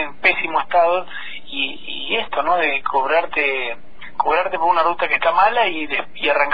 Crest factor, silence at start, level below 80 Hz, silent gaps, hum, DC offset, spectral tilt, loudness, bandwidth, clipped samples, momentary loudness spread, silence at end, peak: 16 dB; 0 s; -52 dBFS; none; none; 4%; -5.5 dB/octave; -18 LUFS; 5 kHz; under 0.1%; 11 LU; 0 s; -2 dBFS